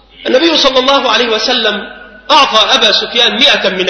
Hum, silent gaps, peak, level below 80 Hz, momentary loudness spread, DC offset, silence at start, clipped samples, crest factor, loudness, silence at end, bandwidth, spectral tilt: none; none; 0 dBFS; -44 dBFS; 7 LU; under 0.1%; 0.2 s; 0.3%; 10 dB; -8 LUFS; 0 s; 11 kHz; -2 dB/octave